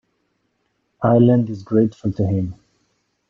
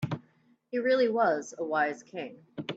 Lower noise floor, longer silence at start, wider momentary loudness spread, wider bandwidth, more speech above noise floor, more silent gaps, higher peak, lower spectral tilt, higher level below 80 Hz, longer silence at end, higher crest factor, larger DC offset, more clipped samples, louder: first, -69 dBFS vs -65 dBFS; first, 1 s vs 0 s; second, 9 LU vs 15 LU; second, 6.6 kHz vs 8 kHz; first, 53 dB vs 37 dB; neither; first, -2 dBFS vs -14 dBFS; first, -10.5 dB/octave vs -5.5 dB/octave; first, -54 dBFS vs -72 dBFS; first, 0.75 s vs 0 s; about the same, 18 dB vs 16 dB; neither; neither; first, -18 LUFS vs -29 LUFS